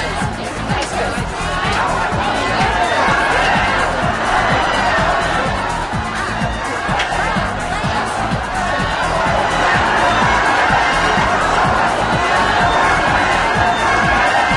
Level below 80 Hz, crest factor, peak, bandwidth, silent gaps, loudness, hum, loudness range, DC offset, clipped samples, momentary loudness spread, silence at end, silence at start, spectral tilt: -30 dBFS; 14 dB; -2 dBFS; 11.5 kHz; none; -15 LUFS; none; 4 LU; under 0.1%; under 0.1%; 7 LU; 0 s; 0 s; -4 dB/octave